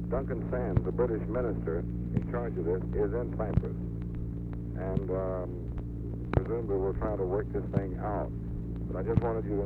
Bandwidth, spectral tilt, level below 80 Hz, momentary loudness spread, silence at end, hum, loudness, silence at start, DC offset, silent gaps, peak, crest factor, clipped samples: 4.2 kHz; -11.5 dB/octave; -40 dBFS; 7 LU; 0 s; none; -33 LUFS; 0 s; under 0.1%; none; -8 dBFS; 24 dB; under 0.1%